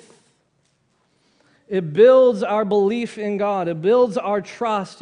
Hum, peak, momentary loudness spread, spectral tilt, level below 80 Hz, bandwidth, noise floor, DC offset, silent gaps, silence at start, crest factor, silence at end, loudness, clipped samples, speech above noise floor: none; -2 dBFS; 12 LU; -6.5 dB/octave; -68 dBFS; 10 kHz; -65 dBFS; under 0.1%; none; 1.7 s; 16 dB; 0.1 s; -18 LUFS; under 0.1%; 48 dB